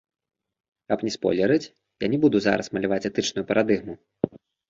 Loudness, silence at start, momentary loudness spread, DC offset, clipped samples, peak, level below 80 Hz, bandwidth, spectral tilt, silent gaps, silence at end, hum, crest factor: -24 LUFS; 0.9 s; 10 LU; under 0.1%; under 0.1%; -4 dBFS; -60 dBFS; 7.8 kHz; -5.5 dB/octave; none; 0.3 s; none; 20 dB